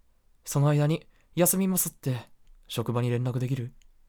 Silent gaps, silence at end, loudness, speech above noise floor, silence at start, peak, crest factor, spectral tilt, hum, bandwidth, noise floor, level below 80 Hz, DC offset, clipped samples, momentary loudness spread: none; 0.4 s; -27 LUFS; 22 dB; 0.45 s; -10 dBFS; 18 dB; -5.5 dB/octave; none; over 20 kHz; -48 dBFS; -58 dBFS; under 0.1%; under 0.1%; 13 LU